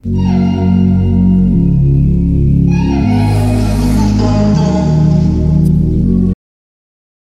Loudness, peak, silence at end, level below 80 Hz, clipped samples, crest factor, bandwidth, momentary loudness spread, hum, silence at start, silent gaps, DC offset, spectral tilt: -11 LUFS; -2 dBFS; 0.95 s; -20 dBFS; under 0.1%; 10 dB; 12.5 kHz; 2 LU; none; 0.05 s; none; under 0.1%; -8.5 dB/octave